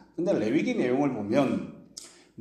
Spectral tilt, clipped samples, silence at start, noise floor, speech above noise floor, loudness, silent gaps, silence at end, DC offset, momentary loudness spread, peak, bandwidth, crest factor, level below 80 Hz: -6.5 dB/octave; under 0.1%; 0.2 s; -48 dBFS; 23 dB; -27 LUFS; none; 0.3 s; under 0.1%; 19 LU; -8 dBFS; 12 kHz; 20 dB; -68 dBFS